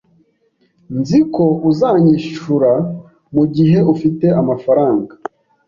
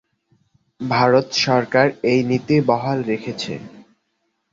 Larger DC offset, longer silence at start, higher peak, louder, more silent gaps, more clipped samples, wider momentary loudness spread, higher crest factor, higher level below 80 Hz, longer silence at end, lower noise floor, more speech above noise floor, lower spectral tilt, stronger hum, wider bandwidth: neither; about the same, 0.9 s vs 0.8 s; about the same, -2 dBFS vs -2 dBFS; first, -14 LUFS vs -18 LUFS; neither; neither; about the same, 13 LU vs 12 LU; second, 12 dB vs 18 dB; first, -52 dBFS vs -60 dBFS; about the same, 0.6 s vs 0.7 s; second, -60 dBFS vs -71 dBFS; second, 47 dB vs 53 dB; first, -9 dB/octave vs -5.5 dB/octave; neither; about the same, 7.2 kHz vs 7.8 kHz